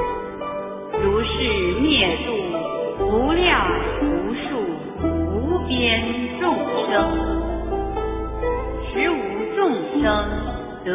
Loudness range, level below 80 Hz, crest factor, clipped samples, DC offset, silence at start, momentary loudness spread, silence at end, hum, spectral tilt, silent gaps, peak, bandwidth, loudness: 3 LU; -32 dBFS; 18 dB; under 0.1%; under 0.1%; 0 s; 9 LU; 0 s; none; -9.5 dB/octave; none; -4 dBFS; 3.9 kHz; -22 LUFS